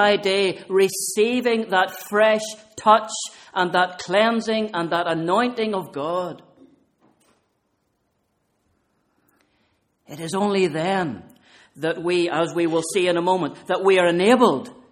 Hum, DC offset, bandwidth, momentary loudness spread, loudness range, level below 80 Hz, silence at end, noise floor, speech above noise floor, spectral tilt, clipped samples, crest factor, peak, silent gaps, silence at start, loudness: none; under 0.1%; 16.5 kHz; 11 LU; 11 LU; -68 dBFS; 0.2 s; -70 dBFS; 50 dB; -4 dB/octave; under 0.1%; 20 dB; -2 dBFS; none; 0 s; -21 LUFS